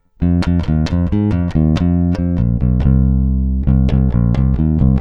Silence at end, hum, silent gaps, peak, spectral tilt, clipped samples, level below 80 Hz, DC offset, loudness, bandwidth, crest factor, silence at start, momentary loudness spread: 0 s; none; none; -2 dBFS; -9.5 dB/octave; under 0.1%; -18 dBFS; under 0.1%; -15 LUFS; 6.8 kHz; 12 dB; 0.2 s; 3 LU